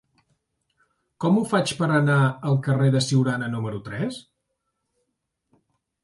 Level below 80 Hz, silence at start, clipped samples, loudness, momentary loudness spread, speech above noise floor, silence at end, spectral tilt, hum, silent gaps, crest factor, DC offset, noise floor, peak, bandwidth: -62 dBFS; 1.2 s; under 0.1%; -23 LUFS; 10 LU; 56 dB; 1.85 s; -6 dB/octave; none; none; 16 dB; under 0.1%; -78 dBFS; -8 dBFS; 11.5 kHz